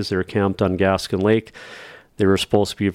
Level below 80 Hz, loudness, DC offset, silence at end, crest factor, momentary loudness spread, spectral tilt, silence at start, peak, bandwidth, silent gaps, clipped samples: -50 dBFS; -20 LUFS; under 0.1%; 0 s; 18 dB; 19 LU; -6 dB/octave; 0 s; -4 dBFS; 15.5 kHz; none; under 0.1%